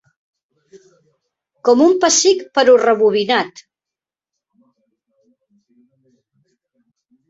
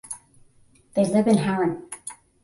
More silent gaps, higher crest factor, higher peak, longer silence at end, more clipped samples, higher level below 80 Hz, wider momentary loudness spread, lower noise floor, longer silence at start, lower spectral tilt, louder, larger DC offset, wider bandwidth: neither; about the same, 18 dB vs 18 dB; first, -2 dBFS vs -8 dBFS; first, 3.8 s vs 0.3 s; neither; about the same, -64 dBFS vs -62 dBFS; second, 7 LU vs 18 LU; first, -88 dBFS vs -57 dBFS; first, 1.65 s vs 0.05 s; second, -2 dB/octave vs -6 dB/octave; first, -13 LUFS vs -22 LUFS; neither; second, 8 kHz vs 11.5 kHz